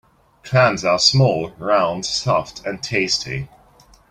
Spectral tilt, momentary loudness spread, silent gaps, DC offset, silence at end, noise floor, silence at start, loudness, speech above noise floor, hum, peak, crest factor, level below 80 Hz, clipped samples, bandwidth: -4 dB/octave; 14 LU; none; under 0.1%; 0.65 s; -51 dBFS; 0.45 s; -18 LUFS; 32 dB; none; 0 dBFS; 20 dB; -50 dBFS; under 0.1%; 11 kHz